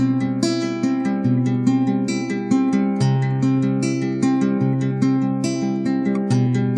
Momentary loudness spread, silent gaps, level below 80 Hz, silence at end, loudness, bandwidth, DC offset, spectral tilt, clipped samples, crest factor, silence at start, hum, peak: 3 LU; none; -62 dBFS; 0 s; -20 LUFS; 10.5 kHz; under 0.1%; -7 dB/octave; under 0.1%; 14 dB; 0 s; none; -6 dBFS